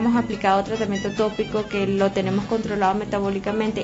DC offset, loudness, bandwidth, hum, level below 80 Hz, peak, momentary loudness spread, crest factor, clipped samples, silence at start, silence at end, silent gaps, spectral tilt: under 0.1%; -23 LUFS; 8 kHz; none; -46 dBFS; -6 dBFS; 4 LU; 16 dB; under 0.1%; 0 s; 0 s; none; -6 dB/octave